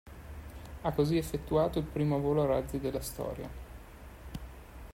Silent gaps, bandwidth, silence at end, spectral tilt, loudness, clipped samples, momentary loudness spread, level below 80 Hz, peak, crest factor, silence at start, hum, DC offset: none; 16 kHz; 0 s; -7 dB/octave; -32 LUFS; under 0.1%; 20 LU; -48 dBFS; -16 dBFS; 18 dB; 0.05 s; none; under 0.1%